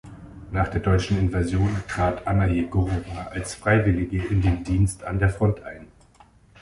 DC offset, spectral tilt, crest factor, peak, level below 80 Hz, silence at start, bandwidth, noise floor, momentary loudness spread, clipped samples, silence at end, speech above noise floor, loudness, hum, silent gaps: under 0.1%; -7 dB/octave; 18 dB; -6 dBFS; -34 dBFS; 0.05 s; 11.5 kHz; -54 dBFS; 10 LU; under 0.1%; 0.75 s; 31 dB; -24 LUFS; none; none